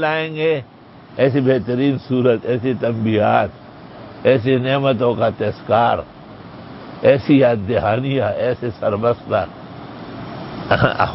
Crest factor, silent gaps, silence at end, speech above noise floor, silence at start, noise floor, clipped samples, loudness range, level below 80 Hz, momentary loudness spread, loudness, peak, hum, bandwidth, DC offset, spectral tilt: 18 dB; none; 0 s; 20 dB; 0 s; -37 dBFS; under 0.1%; 1 LU; -46 dBFS; 20 LU; -17 LUFS; 0 dBFS; none; 5.8 kHz; under 0.1%; -11.5 dB/octave